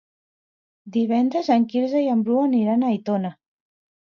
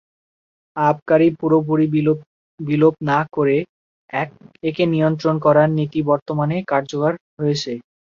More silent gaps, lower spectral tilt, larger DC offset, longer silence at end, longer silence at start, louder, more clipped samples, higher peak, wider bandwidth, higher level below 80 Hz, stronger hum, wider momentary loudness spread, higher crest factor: second, none vs 1.02-1.06 s, 2.26-2.58 s, 3.69-4.08 s, 6.22-6.26 s, 7.20-7.37 s; about the same, -8 dB/octave vs -7.5 dB/octave; neither; first, 0.8 s vs 0.4 s; about the same, 0.85 s vs 0.75 s; about the same, -21 LUFS vs -19 LUFS; neither; second, -6 dBFS vs -2 dBFS; about the same, 6.6 kHz vs 7.2 kHz; second, -74 dBFS vs -60 dBFS; neither; second, 6 LU vs 11 LU; about the same, 16 dB vs 16 dB